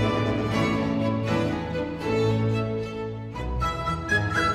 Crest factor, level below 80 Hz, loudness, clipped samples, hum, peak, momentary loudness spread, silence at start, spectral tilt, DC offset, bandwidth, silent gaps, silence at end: 14 dB; -40 dBFS; -26 LUFS; under 0.1%; none; -10 dBFS; 8 LU; 0 s; -6.5 dB/octave; under 0.1%; 12.5 kHz; none; 0 s